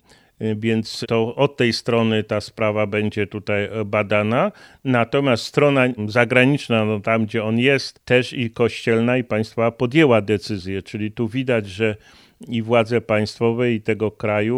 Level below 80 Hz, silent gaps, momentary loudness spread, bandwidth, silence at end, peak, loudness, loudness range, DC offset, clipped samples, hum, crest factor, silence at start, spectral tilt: -58 dBFS; none; 9 LU; 13.5 kHz; 0 s; 0 dBFS; -20 LUFS; 3 LU; under 0.1%; under 0.1%; none; 20 dB; 0.4 s; -6.5 dB/octave